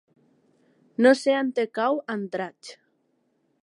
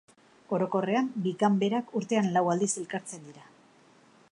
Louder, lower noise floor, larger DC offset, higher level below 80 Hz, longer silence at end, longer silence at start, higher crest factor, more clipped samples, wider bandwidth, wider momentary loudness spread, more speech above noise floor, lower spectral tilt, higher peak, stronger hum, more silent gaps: first, -24 LUFS vs -28 LUFS; first, -70 dBFS vs -59 dBFS; neither; about the same, -84 dBFS vs -80 dBFS; about the same, 0.9 s vs 0.9 s; first, 1 s vs 0.5 s; about the same, 20 dB vs 18 dB; neither; about the same, 11.5 kHz vs 11 kHz; first, 18 LU vs 11 LU; first, 47 dB vs 31 dB; about the same, -5 dB/octave vs -5.5 dB/octave; first, -6 dBFS vs -12 dBFS; neither; neither